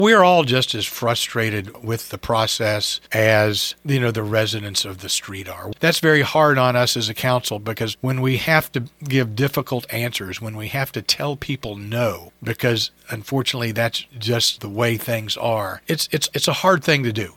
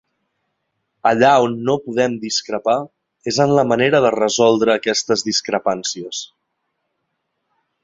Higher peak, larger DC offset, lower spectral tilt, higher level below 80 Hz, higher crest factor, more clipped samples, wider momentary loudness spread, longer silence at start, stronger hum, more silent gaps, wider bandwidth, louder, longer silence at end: about the same, 0 dBFS vs -2 dBFS; neither; about the same, -4 dB/octave vs -4 dB/octave; first, -52 dBFS vs -60 dBFS; about the same, 20 dB vs 18 dB; neither; about the same, 11 LU vs 11 LU; second, 0 s vs 1.05 s; neither; neither; first, 19 kHz vs 7.8 kHz; second, -20 LUFS vs -17 LUFS; second, 0.05 s vs 1.6 s